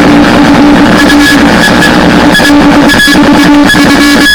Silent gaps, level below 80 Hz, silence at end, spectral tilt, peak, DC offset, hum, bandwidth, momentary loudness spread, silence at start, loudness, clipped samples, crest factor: none; -22 dBFS; 0 s; -4.5 dB/octave; 0 dBFS; 1%; none; over 20 kHz; 1 LU; 0 s; -2 LUFS; 20%; 2 dB